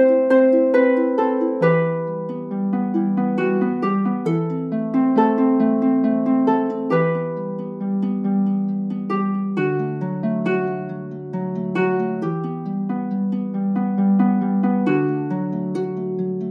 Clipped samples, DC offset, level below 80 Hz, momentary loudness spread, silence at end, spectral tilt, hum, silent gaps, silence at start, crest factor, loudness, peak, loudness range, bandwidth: under 0.1%; under 0.1%; -72 dBFS; 9 LU; 0 s; -10 dB/octave; none; none; 0 s; 16 dB; -20 LUFS; -4 dBFS; 5 LU; 5.2 kHz